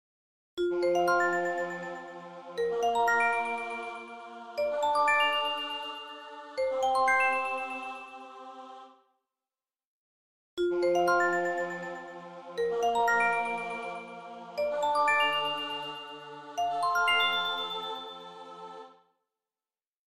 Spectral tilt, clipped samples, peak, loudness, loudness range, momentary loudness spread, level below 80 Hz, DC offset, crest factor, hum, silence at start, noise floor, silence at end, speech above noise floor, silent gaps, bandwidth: -3 dB/octave; under 0.1%; -14 dBFS; -29 LUFS; 4 LU; 19 LU; -70 dBFS; under 0.1%; 16 dB; none; 0.55 s; under -90 dBFS; 1.2 s; over 63 dB; 9.85-10.57 s; 16 kHz